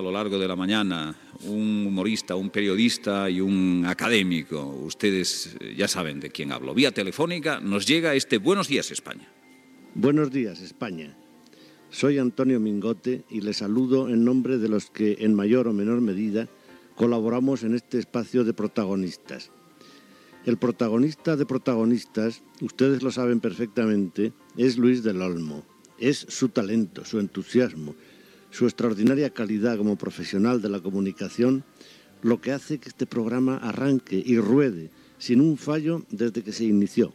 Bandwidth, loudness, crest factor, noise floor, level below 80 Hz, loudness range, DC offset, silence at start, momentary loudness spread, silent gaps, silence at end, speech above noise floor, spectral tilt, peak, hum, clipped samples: 14 kHz; -25 LUFS; 18 dB; -52 dBFS; -72 dBFS; 3 LU; under 0.1%; 0 s; 11 LU; none; 0.05 s; 28 dB; -5.5 dB/octave; -6 dBFS; none; under 0.1%